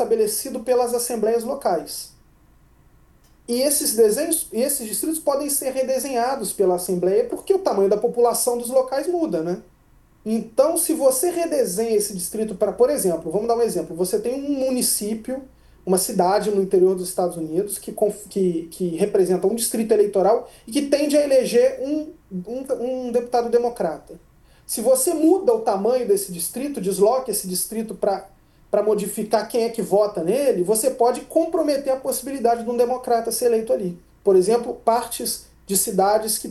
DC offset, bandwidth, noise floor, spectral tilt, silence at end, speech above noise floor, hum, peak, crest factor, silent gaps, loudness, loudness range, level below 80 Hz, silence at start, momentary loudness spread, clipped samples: under 0.1%; 13 kHz; -54 dBFS; -4 dB/octave; 0 s; 33 dB; none; -4 dBFS; 16 dB; none; -21 LUFS; 2 LU; -56 dBFS; 0 s; 8 LU; under 0.1%